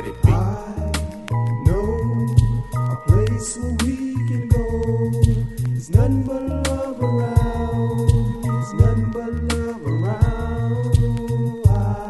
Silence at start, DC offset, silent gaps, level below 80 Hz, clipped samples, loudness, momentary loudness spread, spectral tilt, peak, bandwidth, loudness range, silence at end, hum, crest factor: 0 s; under 0.1%; none; -28 dBFS; under 0.1%; -21 LUFS; 6 LU; -7 dB/octave; 0 dBFS; 12 kHz; 1 LU; 0 s; none; 18 dB